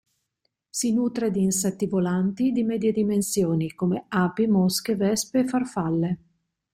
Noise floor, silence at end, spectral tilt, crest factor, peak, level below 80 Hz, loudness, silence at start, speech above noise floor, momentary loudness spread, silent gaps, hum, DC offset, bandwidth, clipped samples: -77 dBFS; 0.6 s; -5.5 dB/octave; 14 dB; -10 dBFS; -60 dBFS; -24 LUFS; 0.75 s; 53 dB; 4 LU; none; none; under 0.1%; 16.5 kHz; under 0.1%